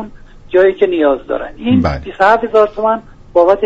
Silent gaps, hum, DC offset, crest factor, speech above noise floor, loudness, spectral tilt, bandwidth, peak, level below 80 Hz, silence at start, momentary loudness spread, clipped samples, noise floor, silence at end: none; none; under 0.1%; 12 dB; 21 dB; -13 LUFS; -7.5 dB/octave; 7.8 kHz; 0 dBFS; -34 dBFS; 0 s; 8 LU; under 0.1%; -33 dBFS; 0 s